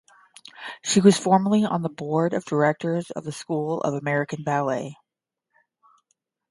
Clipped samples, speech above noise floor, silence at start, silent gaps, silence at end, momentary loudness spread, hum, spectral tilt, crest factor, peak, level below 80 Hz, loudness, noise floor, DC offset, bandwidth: under 0.1%; 62 dB; 0.6 s; none; 1.55 s; 15 LU; none; -5.5 dB/octave; 22 dB; -2 dBFS; -68 dBFS; -23 LUFS; -85 dBFS; under 0.1%; 11.5 kHz